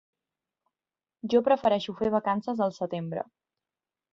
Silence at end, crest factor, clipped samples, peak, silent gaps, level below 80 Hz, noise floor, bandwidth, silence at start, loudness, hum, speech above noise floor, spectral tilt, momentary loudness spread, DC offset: 0.9 s; 20 dB; under 0.1%; -10 dBFS; none; -66 dBFS; under -90 dBFS; 7.4 kHz; 1.25 s; -27 LUFS; none; over 63 dB; -7 dB/octave; 13 LU; under 0.1%